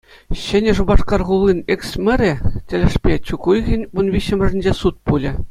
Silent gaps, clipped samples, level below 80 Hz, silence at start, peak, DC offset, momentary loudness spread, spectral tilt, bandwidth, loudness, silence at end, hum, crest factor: none; under 0.1%; -24 dBFS; 0.3 s; 0 dBFS; under 0.1%; 5 LU; -7 dB/octave; 12.5 kHz; -18 LUFS; 0 s; none; 16 dB